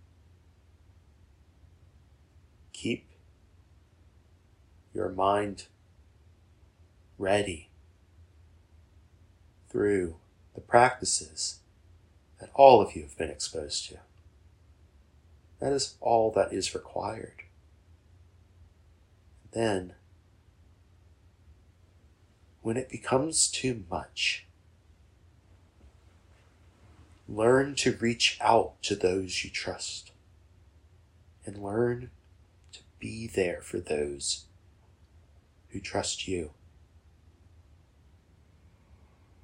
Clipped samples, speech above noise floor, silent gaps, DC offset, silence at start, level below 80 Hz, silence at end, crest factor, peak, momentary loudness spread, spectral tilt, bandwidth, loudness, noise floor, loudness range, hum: under 0.1%; 33 dB; none; under 0.1%; 2.75 s; -58 dBFS; 2.95 s; 30 dB; -2 dBFS; 19 LU; -3.5 dB/octave; 16 kHz; -28 LUFS; -61 dBFS; 13 LU; none